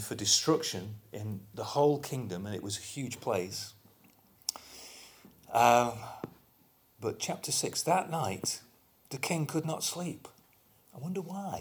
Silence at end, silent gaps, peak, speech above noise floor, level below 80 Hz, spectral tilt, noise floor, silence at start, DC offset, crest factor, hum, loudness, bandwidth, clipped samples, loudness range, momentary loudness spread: 0 s; none; -10 dBFS; 34 dB; -70 dBFS; -3.5 dB/octave; -66 dBFS; 0 s; under 0.1%; 24 dB; none; -32 LUFS; over 20 kHz; under 0.1%; 6 LU; 19 LU